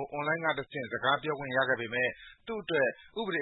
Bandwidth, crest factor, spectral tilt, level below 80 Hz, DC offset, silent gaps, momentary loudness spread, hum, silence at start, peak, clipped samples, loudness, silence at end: 4.1 kHz; 18 dB; -8.5 dB/octave; -68 dBFS; under 0.1%; none; 9 LU; none; 0 s; -14 dBFS; under 0.1%; -31 LUFS; 0 s